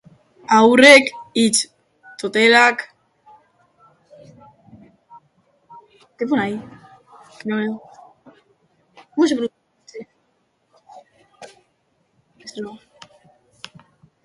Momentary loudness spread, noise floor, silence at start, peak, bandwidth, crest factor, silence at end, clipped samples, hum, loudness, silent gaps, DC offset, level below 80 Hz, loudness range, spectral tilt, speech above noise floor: 30 LU; -66 dBFS; 0.5 s; 0 dBFS; 11.5 kHz; 22 dB; 1.5 s; under 0.1%; none; -15 LUFS; none; under 0.1%; -66 dBFS; 26 LU; -2.5 dB/octave; 51 dB